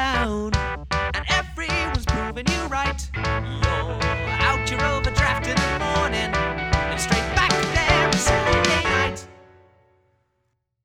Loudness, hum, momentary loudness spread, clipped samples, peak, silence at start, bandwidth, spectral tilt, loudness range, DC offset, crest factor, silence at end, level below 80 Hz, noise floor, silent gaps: -22 LUFS; none; 7 LU; under 0.1%; -2 dBFS; 0 s; 15.5 kHz; -4 dB/octave; 4 LU; under 0.1%; 22 dB; 1.5 s; -30 dBFS; -73 dBFS; none